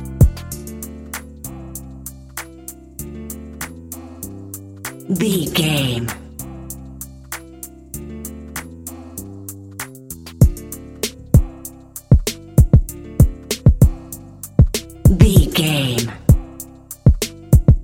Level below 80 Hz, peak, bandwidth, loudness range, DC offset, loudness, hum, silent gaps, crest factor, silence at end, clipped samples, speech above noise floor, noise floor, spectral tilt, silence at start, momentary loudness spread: -22 dBFS; 0 dBFS; 17 kHz; 16 LU; under 0.1%; -17 LUFS; none; none; 18 dB; 0 s; under 0.1%; 19 dB; -37 dBFS; -5.5 dB/octave; 0 s; 19 LU